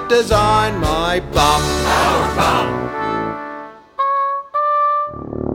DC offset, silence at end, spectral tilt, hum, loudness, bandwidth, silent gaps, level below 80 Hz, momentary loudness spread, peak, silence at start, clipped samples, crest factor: under 0.1%; 0 s; -4.5 dB/octave; none; -16 LUFS; 18.5 kHz; none; -30 dBFS; 11 LU; -2 dBFS; 0 s; under 0.1%; 14 dB